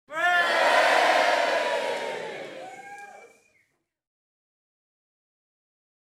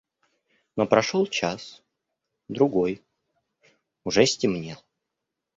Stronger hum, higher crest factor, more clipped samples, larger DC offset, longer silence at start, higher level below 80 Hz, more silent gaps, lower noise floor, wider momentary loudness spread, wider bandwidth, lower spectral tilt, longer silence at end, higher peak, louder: neither; second, 18 dB vs 24 dB; neither; neither; second, 0.1 s vs 0.75 s; second, -82 dBFS vs -62 dBFS; neither; second, -71 dBFS vs -84 dBFS; first, 22 LU vs 18 LU; first, 16 kHz vs 8 kHz; second, -1 dB/octave vs -4.5 dB/octave; first, 2.8 s vs 0.8 s; second, -8 dBFS vs -2 dBFS; about the same, -22 LUFS vs -24 LUFS